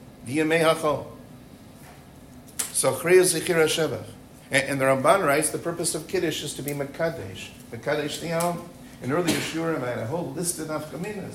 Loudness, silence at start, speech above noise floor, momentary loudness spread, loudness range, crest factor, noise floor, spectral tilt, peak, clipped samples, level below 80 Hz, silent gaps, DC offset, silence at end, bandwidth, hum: -24 LUFS; 0 s; 22 dB; 16 LU; 6 LU; 20 dB; -46 dBFS; -4 dB/octave; -6 dBFS; under 0.1%; -56 dBFS; none; under 0.1%; 0 s; 16 kHz; none